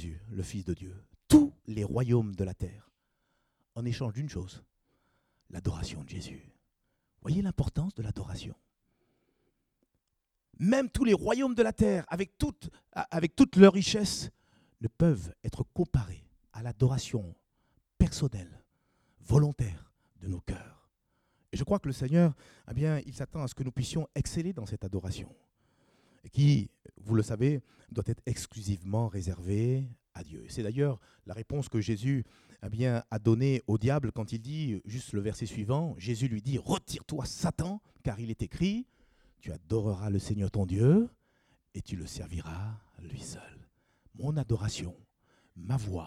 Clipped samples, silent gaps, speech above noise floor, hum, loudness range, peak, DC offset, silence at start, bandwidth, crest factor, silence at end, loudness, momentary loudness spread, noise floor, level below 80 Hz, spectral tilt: under 0.1%; none; 52 dB; none; 11 LU; -4 dBFS; under 0.1%; 0 s; 14 kHz; 28 dB; 0 s; -31 LUFS; 17 LU; -82 dBFS; -50 dBFS; -7 dB/octave